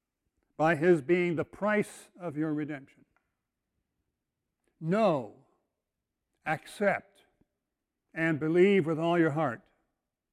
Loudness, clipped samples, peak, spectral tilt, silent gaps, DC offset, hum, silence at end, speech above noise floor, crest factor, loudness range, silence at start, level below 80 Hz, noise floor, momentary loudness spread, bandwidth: -29 LUFS; under 0.1%; -12 dBFS; -7 dB/octave; none; under 0.1%; none; 0.75 s; 58 dB; 18 dB; 7 LU; 0.6 s; -72 dBFS; -86 dBFS; 16 LU; 12.5 kHz